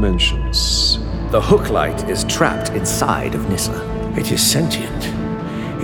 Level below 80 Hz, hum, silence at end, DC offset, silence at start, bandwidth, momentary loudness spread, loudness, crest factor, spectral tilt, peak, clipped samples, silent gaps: -26 dBFS; none; 0 s; under 0.1%; 0 s; 19.5 kHz; 9 LU; -18 LUFS; 16 dB; -4 dB/octave; -2 dBFS; under 0.1%; none